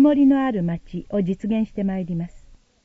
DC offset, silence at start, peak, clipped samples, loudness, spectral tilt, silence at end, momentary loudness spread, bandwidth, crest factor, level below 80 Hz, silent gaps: under 0.1%; 0 s; -8 dBFS; under 0.1%; -22 LUFS; -9.5 dB/octave; 0.45 s; 13 LU; 3.6 kHz; 14 dB; -46 dBFS; none